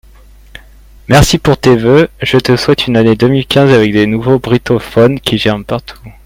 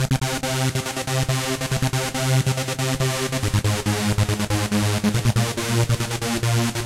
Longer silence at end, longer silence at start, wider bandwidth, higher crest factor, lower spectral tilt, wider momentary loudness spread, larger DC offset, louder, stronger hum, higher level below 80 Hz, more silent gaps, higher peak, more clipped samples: first, 0.15 s vs 0 s; first, 1.1 s vs 0 s; about the same, 16.5 kHz vs 16.5 kHz; about the same, 10 dB vs 14 dB; first, -6 dB/octave vs -4.5 dB/octave; about the same, 5 LU vs 3 LU; neither; first, -10 LUFS vs -22 LUFS; neither; first, -30 dBFS vs -40 dBFS; neither; first, 0 dBFS vs -6 dBFS; first, 0.3% vs under 0.1%